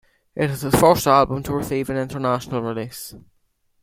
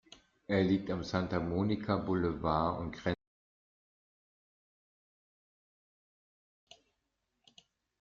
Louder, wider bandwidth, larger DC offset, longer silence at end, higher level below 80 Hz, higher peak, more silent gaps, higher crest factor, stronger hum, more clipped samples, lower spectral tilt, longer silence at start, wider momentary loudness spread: first, -20 LUFS vs -34 LUFS; first, 16.5 kHz vs 7.4 kHz; neither; second, 0.6 s vs 4.85 s; first, -46 dBFS vs -60 dBFS; first, -2 dBFS vs -16 dBFS; neither; about the same, 20 dB vs 20 dB; neither; neither; about the same, -5.5 dB/octave vs -6 dB/octave; second, 0.35 s vs 0.5 s; first, 17 LU vs 7 LU